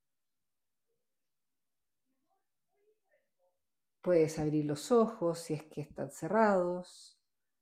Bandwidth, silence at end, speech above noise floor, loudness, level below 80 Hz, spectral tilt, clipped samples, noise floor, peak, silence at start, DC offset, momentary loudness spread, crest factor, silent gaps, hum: 15.5 kHz; 0.6 s; over 58 dB; -32 LUFS; -70 dBFS; -6.5 dB/octave; under 0.1%; under -90 dBFS; -14 dBFS; 4.05 s; under 0.1%; 14 LU; 22 dB; none; none